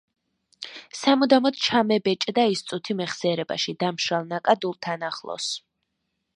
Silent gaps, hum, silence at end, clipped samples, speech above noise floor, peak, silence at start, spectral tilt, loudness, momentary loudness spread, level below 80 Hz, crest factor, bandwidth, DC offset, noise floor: none; none; 0.8 s; under 0.1%; 54 dB; -4 dBFS; 0.6 s; -4 dB/octave; -24 LUFS; 11 LU; -72 dBFS; 20 dB; 11 kHz; under 0.1%; -78 dBFS